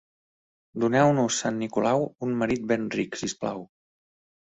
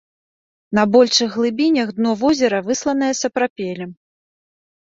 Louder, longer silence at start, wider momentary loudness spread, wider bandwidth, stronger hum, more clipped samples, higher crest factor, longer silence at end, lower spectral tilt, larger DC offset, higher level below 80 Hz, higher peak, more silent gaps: second, -26 LUFS vs -17 LUFS; about the same, 0.75 s vs 0.7 s; about the same, 11 LU vs 12 LU; about the same, 8.4 kHz vs 7.8 kHz; neither; neither; about the same, 20 dB vs 18 dB; second, 0.75 s vs 0.95 s; first, -5 dB/octave vs -3.5 dB/octave; neither; about the same, -62 dBFS vs -60 dBFS; second, -6 dBFS vs -2 dBFS; second, none vs 3.50-3.56 s